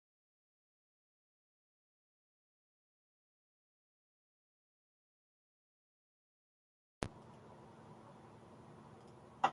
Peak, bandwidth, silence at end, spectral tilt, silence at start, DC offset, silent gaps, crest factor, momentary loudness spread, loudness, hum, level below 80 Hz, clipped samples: -16 dBFS; 11 kHz; 0 s; -4.5 dB/octave; 7 s; under 0.1%; none; 36 dB; 11 LU; -51 LUFS; none; -72 dBFS; under 0.1%